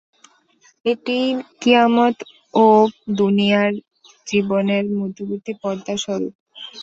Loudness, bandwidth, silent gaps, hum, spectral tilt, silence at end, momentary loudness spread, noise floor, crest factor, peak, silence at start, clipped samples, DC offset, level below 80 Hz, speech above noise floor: -18 LUFS; 7.8 kHz; 6.35-6.46 s; none; -5.5 dB/octave; 0 s; 15 LU; -56 dBFS; 18 dB; -2 dBFS; 0.85 s; under 0.1%; under 0.1%; -62 dBFS; 39 dB